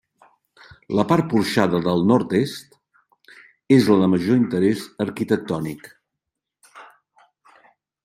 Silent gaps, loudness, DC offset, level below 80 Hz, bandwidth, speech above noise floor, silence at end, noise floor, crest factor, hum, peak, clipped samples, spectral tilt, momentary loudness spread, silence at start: none; -20 LUFS; under 0.1%; -60 dBFS; 15 kHz; 64 dB; 1.2 s; -83 dBFS; 20 dB; none; -2 dBFS; under 0.1%; -7 dB/octave; 11 LU; 0.9 s